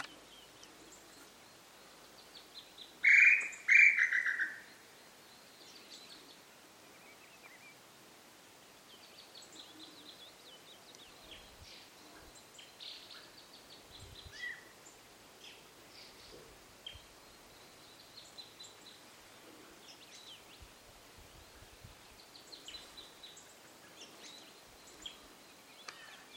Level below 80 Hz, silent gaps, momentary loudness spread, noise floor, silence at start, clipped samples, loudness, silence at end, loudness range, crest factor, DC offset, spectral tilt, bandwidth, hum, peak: -72 dBFS; none; 25 LU; -59 dBFS; 0 s; under 0.1%; -27 LUFS; 1.3 s; 27 LU; 26 dB; under 0.1%; -0.5 dB/octave; 16.5 kHz; none; -12 dBFS